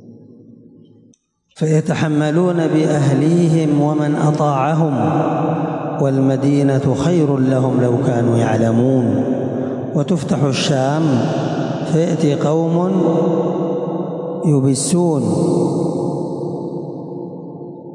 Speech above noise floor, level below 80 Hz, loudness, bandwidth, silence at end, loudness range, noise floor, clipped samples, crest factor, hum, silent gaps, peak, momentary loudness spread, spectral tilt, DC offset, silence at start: 40 dB; -56 dBFS; -16 LUFS; 11.5 kHz; 0 s; 3 LU; -55 dBFS; under 0.1%; 12 dB; none; none; -4 dBFS; 8 LU; -7 dB/octave; under 0.1%; 0.05 s